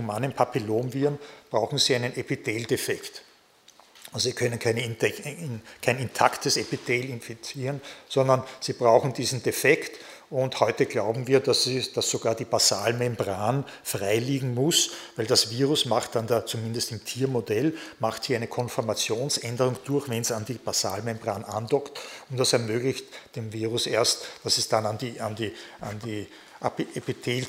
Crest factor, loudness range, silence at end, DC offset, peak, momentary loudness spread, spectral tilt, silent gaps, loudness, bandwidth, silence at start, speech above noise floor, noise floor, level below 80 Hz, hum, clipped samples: 26 dB; 4 LU; 0 s; under 0.1%; -2 dBFS; 13 LU; -3.5 dB/octave; none; -26 LUFS; 16 kHz; 0 s; 31 dB; -57 dBFS; -66 dBFS; none; under 0.1%